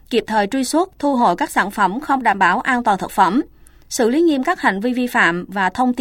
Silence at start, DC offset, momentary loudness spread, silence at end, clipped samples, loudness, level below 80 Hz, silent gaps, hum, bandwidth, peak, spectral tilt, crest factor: 0.1 s; under 0.1%; 5 LU; 0 s; under 0.1%; -17 LUFS; -48 dBFS; none; none; 17 kHz; -2 dBFS; -4 dB/octave; 16 dB